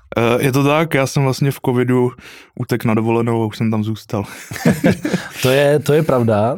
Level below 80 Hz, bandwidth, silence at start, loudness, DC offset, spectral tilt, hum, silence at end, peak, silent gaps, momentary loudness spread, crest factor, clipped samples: -50 dBFS; 17 kHz; 0.15 s; -16 LUFS; under 0.1%; -6.5 dB/octave; none; 0 s; 0 dBFS; none; 8 LU; 16 dB; under 0.1%